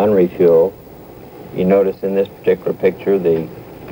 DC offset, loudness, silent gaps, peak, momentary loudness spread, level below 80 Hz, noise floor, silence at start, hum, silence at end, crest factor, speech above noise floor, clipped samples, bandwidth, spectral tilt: under 0.1%; -16 LUFS; none; -2 dBFS; 18 LU; -48 dBFS; -37 dBFS; 0 s; none; 0 s; 14 dB; 22 dB; under 0.1%; 17 kHz; -9 dB/octave